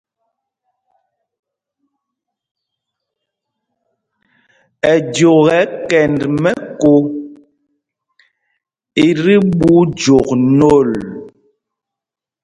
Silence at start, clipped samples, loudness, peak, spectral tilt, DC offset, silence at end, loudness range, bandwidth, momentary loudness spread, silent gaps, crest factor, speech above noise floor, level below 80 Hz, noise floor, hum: 4.85 s; under 0.1%; -12 LUFS; 0 dBFS; -6.5 dB/octave; under 0.1%; 1.15 s; 4 LU; 10.5 kHz; 12 LU; none; 16 dB; 75 dB; -46 dBFS; -86 dBFS; none